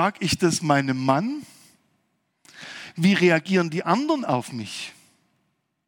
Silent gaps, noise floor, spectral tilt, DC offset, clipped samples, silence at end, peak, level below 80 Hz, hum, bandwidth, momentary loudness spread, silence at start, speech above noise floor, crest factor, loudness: none; -73 dBFS; -5 dB/octave; under 0.1%; under 0.1%; 0.95 s; -4 dBFS; -62 dBFS; none; 18 kHz; 18 LU; 0 s; 51 dB; 20 dB; -22 LUFS